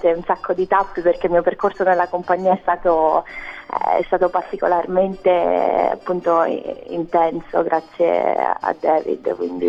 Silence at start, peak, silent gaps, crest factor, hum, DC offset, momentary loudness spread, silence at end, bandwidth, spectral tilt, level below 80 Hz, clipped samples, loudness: 0 s; -4 dBFS; none; 16 dB; none; under 0.1%; 6 LU; 0 s; 7 kHz; -7.5 dB/octave; -48 dBFS; under 0.1%; -19 LUFS